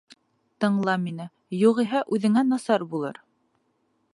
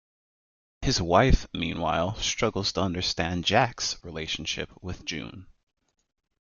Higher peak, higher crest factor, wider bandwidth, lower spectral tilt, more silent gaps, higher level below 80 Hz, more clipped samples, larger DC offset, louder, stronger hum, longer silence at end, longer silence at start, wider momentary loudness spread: about the same, -8 dBFS vs -6 dBFS; about the same, 18 dB vs 22 dB; first, 11.5 kHz vs 7.4 kHz; first, -6.5 dB/octave vs -4 dB/octave; neither; second, -76 dBFS vs -38 dBFS; neither; neither; first, -24 LUFS vs -27 LUFS; neither; about the same, 1 s vs 1 s; second, 0.6 s vs 0.8 s; about the same, 12 LU vs 12 LU